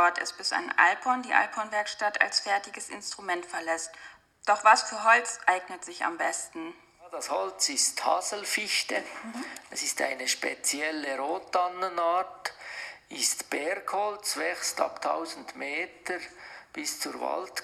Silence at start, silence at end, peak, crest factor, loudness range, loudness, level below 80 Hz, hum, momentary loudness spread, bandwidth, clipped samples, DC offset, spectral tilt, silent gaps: 0 s; 0 s; -6 dBFS; 24 dB; 5 LU; -28 LUFS; -76 dBFS; none; 16 LU; 15 kHz; under 0.1%; under 0.1%; 0.5 dB/octave; none